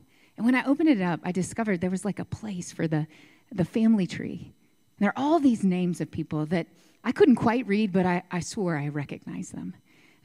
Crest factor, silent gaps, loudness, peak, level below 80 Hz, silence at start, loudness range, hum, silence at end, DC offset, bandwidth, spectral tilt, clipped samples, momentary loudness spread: 18 dB; none; -26 LUFS; -8 dBFS; -62 dBFS; 0.4 s; 4 LU; none; 0.55 s; under 0.1%; 12 kHz; -6.5 dB/octave; under 0.1%; 14 LU